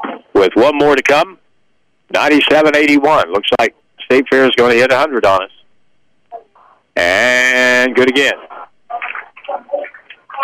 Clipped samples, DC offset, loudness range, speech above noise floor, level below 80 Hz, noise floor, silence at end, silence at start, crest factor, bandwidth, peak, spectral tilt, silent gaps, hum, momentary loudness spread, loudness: under 0.1%; under 0.1%; 3 LU; 52 dB; -50 dBFS; -63 dBFS; 0 s; 0 s; 10 dB; 16 kHz; -4 dBFS; -3.5 dB/octave; none; none; 15 LU; -11 LUFS